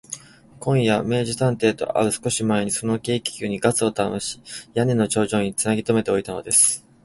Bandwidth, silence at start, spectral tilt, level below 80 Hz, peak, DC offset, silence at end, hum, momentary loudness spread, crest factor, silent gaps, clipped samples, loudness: 12 kHz; 0.1 s; -4 dB/octave; -54 dBFS; -4 dBFS; under 0.1%; 0.25 s; none; 9 LU; 18 dB; none; under 0.1%; -21 LUFS